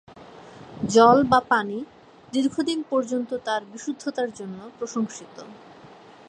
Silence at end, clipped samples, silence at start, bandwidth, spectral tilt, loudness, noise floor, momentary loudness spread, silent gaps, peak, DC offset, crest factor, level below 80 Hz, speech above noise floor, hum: 0.75 s; under 0.1%; 0.15 s; 10.5 kHz; -4.5 dB/octave; -23 LUFS; -47 dBFS; 25 LU; none; -2 dBFS; under 0.1%; 22 dB; -60 dBFS; 24 dB; none